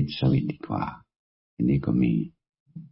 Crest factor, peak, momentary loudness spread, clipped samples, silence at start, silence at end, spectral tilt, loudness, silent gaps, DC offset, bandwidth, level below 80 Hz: 14 dB; -14 dBFS; 12 LU; under 0.1%; 0 s; 0.05 s; -12 dB/octave; -26 LUFS; 1.16-1.57 s, 2.60-2.66 s; under 0.1%; 5.8 kHz; -48 dBFS